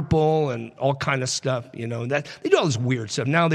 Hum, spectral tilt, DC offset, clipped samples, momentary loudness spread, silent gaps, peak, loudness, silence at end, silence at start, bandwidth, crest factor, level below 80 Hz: none; -5 dB/octave; under 0.1%; under 0.1%; 7 LU; none; -4 dBFS; -23 LUFS; 0 s; 0 s; 11.5 kHz; 18 dB; -52 dBFS